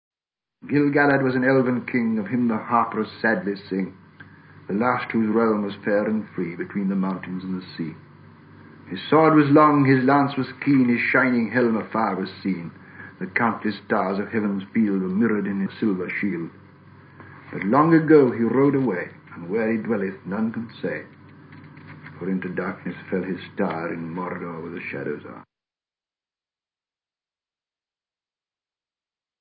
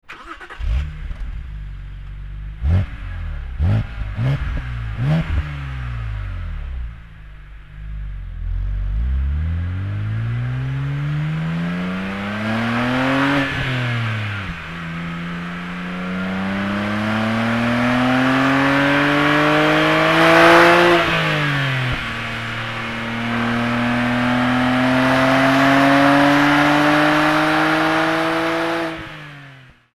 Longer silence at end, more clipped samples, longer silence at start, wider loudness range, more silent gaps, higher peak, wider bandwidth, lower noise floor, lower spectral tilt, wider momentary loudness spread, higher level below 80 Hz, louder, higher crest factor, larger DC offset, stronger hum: first, 4 s vs 0.35 s; neither; first, 0.65 s vs 0.1 s; about the same, 11 LU vs 13 LU; neither; second, -4 dBFS vs 0 dBFS; second, 5.2 kHz vs 15.5 kHz; first, under -90 dBFS vs -43 dBFS; first, -12 dB/octave vs -6 dB/octave; second, 15 LU vs 18 LU; second, -64 dBFS vs -30 dBFS; second, -22 LUFS vs -18 LUFS; about the same, 20 dB vs 18 dB; neither; neither